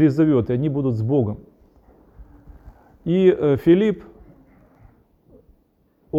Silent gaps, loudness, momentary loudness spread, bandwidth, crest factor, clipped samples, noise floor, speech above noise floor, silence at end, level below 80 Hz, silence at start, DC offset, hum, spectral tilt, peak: none; -19 LUFS; 13 LU; 7.2 kHz; 18 dB; under 0.1%; -62 dBFS; 44 dB; 0 s; -50 dBFS; 0 s; under 0.1%; none; -10 dB/octave; -4 dBFS